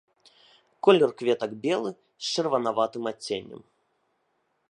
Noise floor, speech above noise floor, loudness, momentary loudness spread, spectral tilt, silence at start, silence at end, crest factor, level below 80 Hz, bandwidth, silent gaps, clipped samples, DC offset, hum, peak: -73 dBFS; 48 dB; -26 LUFS; 14 LU; -4.5 dB/octave; 0.85 s; 1.15 s; 24 dB; -76 dBFS; 11 kHz; none; under 0.1%; under 0.1%; none; -4 dBFS